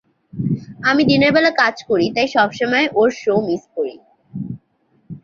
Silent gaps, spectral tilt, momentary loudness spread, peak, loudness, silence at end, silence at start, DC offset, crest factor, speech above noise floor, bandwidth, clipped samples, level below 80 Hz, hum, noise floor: none; -6 dB/octave; 17 LU; -2 dBFS; -17 LUFS; 0.05 s; 0.35 s; under 0.1%; 16 dB; 44 dB; 7.4 kHz; under 0.1%; -54 dBFS; none; -61 dBFS